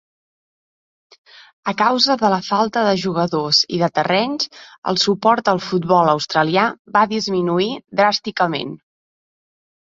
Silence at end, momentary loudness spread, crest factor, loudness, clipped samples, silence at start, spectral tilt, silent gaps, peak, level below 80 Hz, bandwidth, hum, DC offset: 1.05 s; 7 LU; 18 dB; -17 LUFS; under 0.1%; 1.65 s; -4.5 dB/octave; 4.78-4.82 s, 6.79-6.85 s; -2 dBFS; -60 dBFS; 7.8 kHz; none; under 0.1%